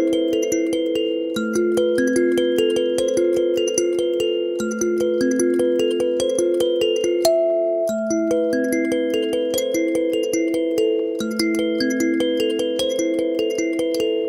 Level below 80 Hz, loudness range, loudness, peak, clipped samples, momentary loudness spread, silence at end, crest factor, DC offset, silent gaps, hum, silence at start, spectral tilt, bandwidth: -58 dBFS; 1 LU; -20 LUFS; -2 dBFS; under 0.1%; 3 LU; 0 s; 18 dB; under 0.1%; none; none; 0 s; -3.5 dB/octave; 16 kHz